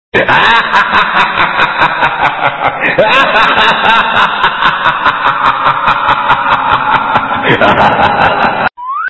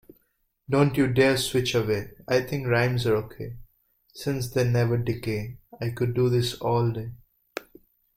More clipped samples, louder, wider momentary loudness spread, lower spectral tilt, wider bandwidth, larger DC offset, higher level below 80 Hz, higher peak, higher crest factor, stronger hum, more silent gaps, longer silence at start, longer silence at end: first, 0.8% vs under 0.1%; first, -8 LUFS vs -25 LUFS; second, 4 LU vs 18 LU; about the same, -5 dB/octave vs -6 dB/octave; second, 8 kHz vs 15.5 kHz; first, 1% vs under 0.1%; first, -38 dBFS vs -52 dBFS; first, 0 dBFS vs -6 dBFS; second, 10 dB vs 20 dB; neither; neither; second, 0.15 s vs 0.7 s; second, 0 s vs 0.55 s